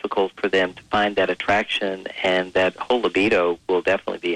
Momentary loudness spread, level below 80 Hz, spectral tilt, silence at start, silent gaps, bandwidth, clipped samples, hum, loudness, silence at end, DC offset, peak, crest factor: 5 LU; -56 dBFS; -4.5 dB/octave; 0.05 s; none; 10.5 kHz; under 0.1%; none; -21 LUFS; 0 s; under 0.1%; -8 dBFS; 12 dB